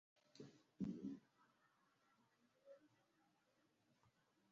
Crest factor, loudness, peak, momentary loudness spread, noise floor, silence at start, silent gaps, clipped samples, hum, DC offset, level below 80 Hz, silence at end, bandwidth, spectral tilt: 24 dB; -54 LUFS; -36 dBFS; 19 LU; -83 dBFS; 0.35 s; none; under 0.1%; none; under 0.1%; -88 dBFS; 0.45 s; 7.2 kHz; -8 dB/octave